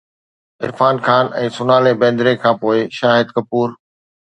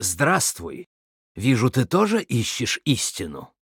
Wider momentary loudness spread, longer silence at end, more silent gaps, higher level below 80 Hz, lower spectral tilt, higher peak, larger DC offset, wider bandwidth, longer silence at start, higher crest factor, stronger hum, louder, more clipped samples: second, 7 LU vs 15 LU; first, 0.6 s vs 0.25 s; second, none vs 0.86-1.35 s; about the same, -60 dBFS vs -56 dBFS; first, -6.5 dB/octave vs -4 dB/octave; first, 0 dBFS vs -4 dBFS; neither; second, 9.2 kHz vs 19 kHz; first, 0.6 s vs 0 s; about the same, 16 dB vs 18 dB; neither; first, -15 LUFS vs -22 LUFS; neither